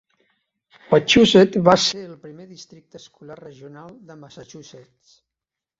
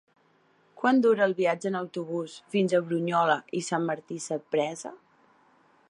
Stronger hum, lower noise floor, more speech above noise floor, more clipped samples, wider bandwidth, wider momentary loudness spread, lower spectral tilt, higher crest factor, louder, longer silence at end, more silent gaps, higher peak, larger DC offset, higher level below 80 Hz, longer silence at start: neither; first, -87 dBFS vs -65 dBFS; first, 67 dB vs 38 dB; neither; second, 8 kHz vs 11 kHz; first, 27 LU vs 11 LU; about the same, -4.5 dB/octave vs -5.5 dB/octave; about the same, 22 dB vs 18 dB; first, -15 LUFS vs -27 LUFS; first, 1.35 s vs 0.95 s; neither; first, 0 dBFS vs -10 dBFS; neither; first, -54 dBFS vs -80 dBFS; about the same, 0.9 s vs 0.8 s